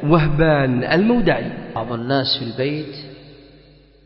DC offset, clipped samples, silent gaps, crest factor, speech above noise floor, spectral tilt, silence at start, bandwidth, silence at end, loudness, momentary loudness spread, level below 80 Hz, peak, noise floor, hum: under 0.1%; under 0.1%; none; 18 dB; 31 dB; -10 dB/octave; 0 s; 5.8 kHz; 0.75 s; -19 LUFS; 12 LU; -36 dBFS; -2 dBFS; -48 dBFS; none